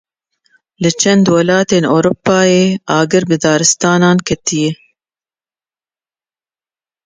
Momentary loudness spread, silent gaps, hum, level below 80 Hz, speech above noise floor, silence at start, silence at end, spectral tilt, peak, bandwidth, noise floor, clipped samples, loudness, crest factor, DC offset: 6 LU; none; none; -50 dBFS; over 79 dB; 0.8 s; 2.3 s; -4.5 dB/octave; 0 dBFS; 9.6 kHz; under -90 dBFS; under 0.1%; -12 LUFS; 14 dB; under 0.1%